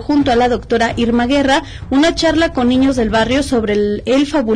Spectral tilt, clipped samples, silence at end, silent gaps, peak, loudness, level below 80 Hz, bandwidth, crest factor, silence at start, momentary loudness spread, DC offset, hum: -5 dB/octave; under 0.1%; 0 s; none; -4 dBFS; -14 LUFS; -32 dBFS; 10.5 kHz; 10 dB; 0 s; 3 LU; under 0.1%; none